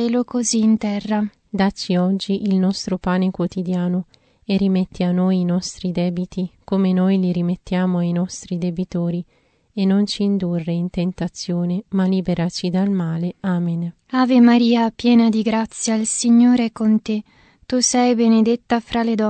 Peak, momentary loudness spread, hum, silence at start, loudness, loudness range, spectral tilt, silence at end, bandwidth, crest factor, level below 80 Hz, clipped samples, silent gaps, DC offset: -4 dBFS; 9 LU; none; 0 s; -19 LUFS; 5 LU; -5.5 dB/octave; 0 s; 9 kHz; 16 dB; -50 dBFS; under 0.1%; none; under 0.1%